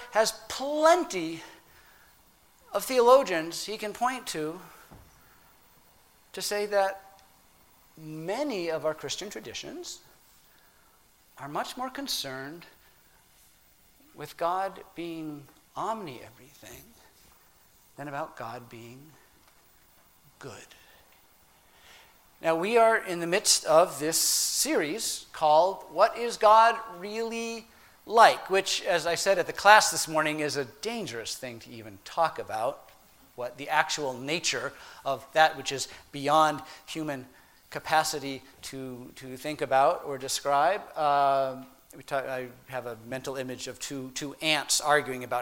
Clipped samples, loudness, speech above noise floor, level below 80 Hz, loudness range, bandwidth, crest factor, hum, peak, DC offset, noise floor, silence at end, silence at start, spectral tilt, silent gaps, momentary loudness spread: under 0.1%; -27 LUFS; 33 dB; -66 dBFS; 14 LU; 16.5 kHz; 28 dB; none; -2 dBFS; under 0.1%; -61 dBFS; 0 s; 0 s; -2 dB/octave; none; 21 LU